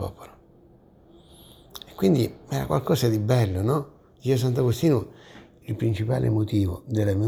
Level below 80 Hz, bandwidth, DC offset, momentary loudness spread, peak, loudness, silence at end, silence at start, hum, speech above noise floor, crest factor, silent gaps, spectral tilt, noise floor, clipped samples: -50 dBFS; 17 kHz; under 0.1%; 18 LU; -8 dBFS; -24 LUFS; 0 s; 0 s; none; 31 dB; 16 dB; none; -7.5 dB/octave; -54 dBFS; under 0.1%